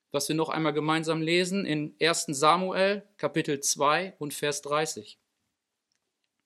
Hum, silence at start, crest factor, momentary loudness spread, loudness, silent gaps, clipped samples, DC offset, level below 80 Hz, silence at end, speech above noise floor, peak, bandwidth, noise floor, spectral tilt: none; 0.15 s; 22 dB; 8 LU; -27 LUFS; none; under 0.1%; under 0.1%; -80 dBFS; 1.3 s; 55 dB; -8 dBFS; 15 kHz; -82 dBFS; -3.5 dB/octave